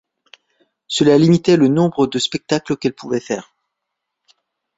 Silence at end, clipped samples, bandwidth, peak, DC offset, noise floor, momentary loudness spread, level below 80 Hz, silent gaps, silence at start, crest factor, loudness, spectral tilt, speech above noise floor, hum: 1.35 s; under 0.1%; 8 kHz; -2 dBFS; under 0.1%; -78 dBFS; 11 LU; -56 dBFS; none; 0.9 s; 16 dB; -16 LUFS; -6 dB/octave; 63 dB; none